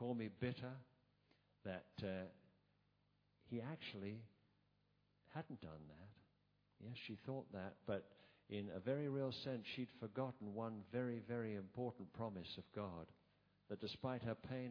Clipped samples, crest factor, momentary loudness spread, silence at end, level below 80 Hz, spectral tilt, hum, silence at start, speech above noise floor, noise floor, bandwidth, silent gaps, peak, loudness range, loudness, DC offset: under 0.1%; 20 dB; 12 LU; 0 s; -78 dBFS; -5.5 dB/octave; 50 Hz at -75 dBFS; 0 s; 33 dB; -81 dBFS; 5.4 kHz; none; -30 dBFS; 8 LU; -49 LUFS; under 0.1%